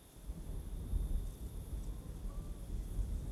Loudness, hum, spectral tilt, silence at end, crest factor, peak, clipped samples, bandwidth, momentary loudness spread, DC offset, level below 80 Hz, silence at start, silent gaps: -45 LUFS; none; -6.5 dB/octave; 0 s; 16 dB; -26 dBFS; under 0.1%; 14 kHz; 7 LU; under 0.1%; -42 dBFS; 0 s; none